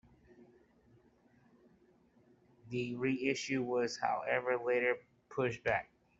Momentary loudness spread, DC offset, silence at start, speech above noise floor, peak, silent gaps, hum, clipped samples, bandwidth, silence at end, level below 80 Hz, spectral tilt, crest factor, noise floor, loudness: 7 LU; under 0.1%; 0.4 s; 33 dB; -16 dBFS; none; none; under 0.1%; 8 kHz; 0.35 s; -72 dBFS; -5 dB/octave; 22 dB; -68 dBFS; -36 LUFS